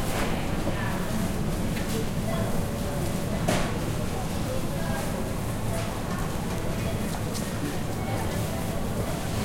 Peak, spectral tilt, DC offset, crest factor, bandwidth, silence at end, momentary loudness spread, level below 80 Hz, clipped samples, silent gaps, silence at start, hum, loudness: -10 dBFS; -5.5 dB/octave; under 0.1%; 16 dB; 16.5 kHz; 0 s; 2 LU; -36 dBFS; under 0.1%; none; 0 s; none; -29 LUFS